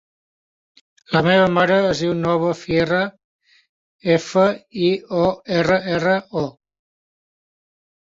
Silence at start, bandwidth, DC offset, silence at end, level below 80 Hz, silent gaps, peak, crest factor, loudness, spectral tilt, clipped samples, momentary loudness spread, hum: 1.1 s; 7.8 kHz; under 0.1%; 1.5 s; -52 dBFS; 3.24-3.39 s, 3.69-3.99 s; -2 dBFS; 18 dB; -19 LUFS; -6 dB/octave; under 0.1%; 7 LU; none